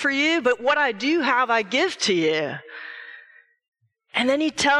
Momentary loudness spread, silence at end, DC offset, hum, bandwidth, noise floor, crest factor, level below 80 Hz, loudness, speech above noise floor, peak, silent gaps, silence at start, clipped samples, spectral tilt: 17 LU; 0 s; under 0.1%; none; 12 kHz; -52 dBFS; 16 dB; -64 dBFS; -21 LUFS; 31 dB; -6 dBFS; 3.68-3.72 s; 0 s; under 0.1%; -3 dB/octave